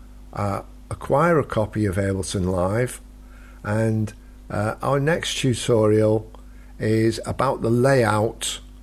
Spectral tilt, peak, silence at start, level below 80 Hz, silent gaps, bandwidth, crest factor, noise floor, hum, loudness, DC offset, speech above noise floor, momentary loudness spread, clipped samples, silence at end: -5.5 dB/octave; -6 dBFS; 0 s; -42 dBFS; none; 14 kHz; 16 dB; -42 dBFS; none; -22 LUFS; under 0.1%; 21 dB; 13 LU; under 0.1%; 0 s